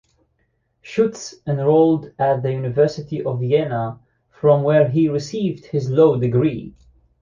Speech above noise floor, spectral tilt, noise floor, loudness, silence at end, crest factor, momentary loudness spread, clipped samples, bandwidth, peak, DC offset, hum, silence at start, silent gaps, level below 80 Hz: 49 dB; -7.5 dB/octave; -67 dBFS; -19 LUFS; 0.5 s; 16 dB; 10 LU; under 0.1%; 7.4 kHz; -2 dBFS; under 0.1%; none; 0.85 s; none; -54 dBFS